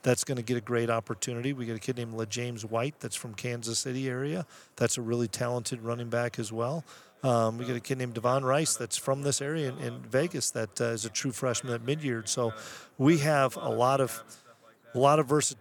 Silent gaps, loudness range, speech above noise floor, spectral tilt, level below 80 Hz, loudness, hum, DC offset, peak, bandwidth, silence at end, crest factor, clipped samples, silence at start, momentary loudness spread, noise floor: none; 4 LU; 28 dB; -4.5 dB/octave; -78 dBFS; -30 LUFS; none; under 0.1%; -10 dBFS; 19 kHz; 0.05 s; 20 dB; under 0.1%; 0.05 s; 9 LU; -57 dBFS